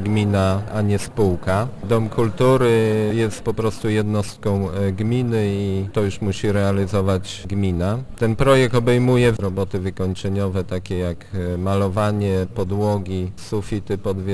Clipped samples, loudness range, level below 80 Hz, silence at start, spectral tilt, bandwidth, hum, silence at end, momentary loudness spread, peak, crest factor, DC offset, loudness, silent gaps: under 0.1%; 4 LU; -40 dBFS; 0 s; -7 dB/octave; 11 kHz; none; 0 s; 9 LU; -2 dBFS; 18 dB; under 0.1%; -20 LUFS; none